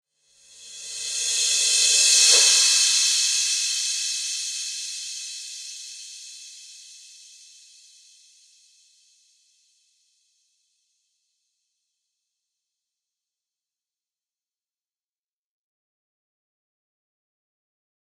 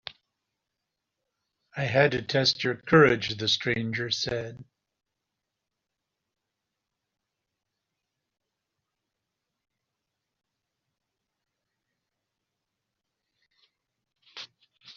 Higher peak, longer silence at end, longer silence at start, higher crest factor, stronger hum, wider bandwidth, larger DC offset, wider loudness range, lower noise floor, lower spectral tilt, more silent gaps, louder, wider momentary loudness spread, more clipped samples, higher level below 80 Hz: first, -2 dBFS vs -6 dBFS; first, 11.05 s vs 0.05 s; second, 0.6 s vs 1.75 s; about the same, 26 dB vs 26 dB; neither; first, 16.5 kHz vs 7.4 kHz; neither; first, 22 LU vs 11 LU; first, under -90 dBFS vs -85 dBFS; second, 5.5 dB/octave vs -3 dB/octave; neither; first, -18 LUFS vs -25 LUFS; about the same, 24 LU vs 24 LU; neither; second, -82 dBFS vs -64 dBFS